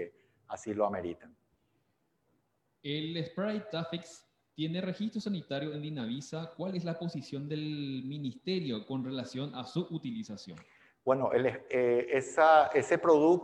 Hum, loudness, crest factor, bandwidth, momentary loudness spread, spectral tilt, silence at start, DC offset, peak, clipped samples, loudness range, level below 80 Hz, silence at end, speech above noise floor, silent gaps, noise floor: none; -32 LUFS; 22 dB; 10.5 kHz; 16 LU; -6 dB/octave; 0 s; under 0.1%; -10 dBFS; under 0.1%; 10 LU; -76 dBFS; 0 s; 45 dB; none; -77 dBFS